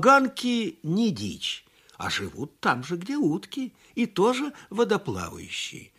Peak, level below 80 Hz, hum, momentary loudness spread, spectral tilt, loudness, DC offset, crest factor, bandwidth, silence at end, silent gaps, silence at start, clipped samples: -4 dBFS; -62 dBFS; none; 11 LU; -5 dB/octave; -27 LUFS; under 0.1%; 22 dB; 15 kHz; 0.15 s; none; 0 s; under 0.1%